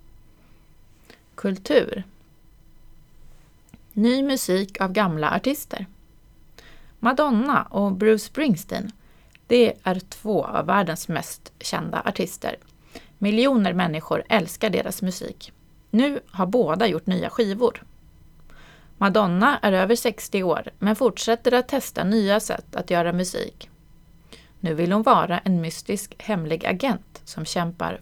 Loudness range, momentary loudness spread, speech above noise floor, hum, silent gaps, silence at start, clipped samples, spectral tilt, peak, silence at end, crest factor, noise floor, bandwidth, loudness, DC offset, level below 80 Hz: 4 LU; 12 LU; 30 dB; none; none; 1.4 s; under 0.1%; -5.5 dB/octave; -2 dBFS; 0 s; 22 dB; -52 dBFS; 19 kHz; -23 LUFS; under 0.1%; -52 dBFS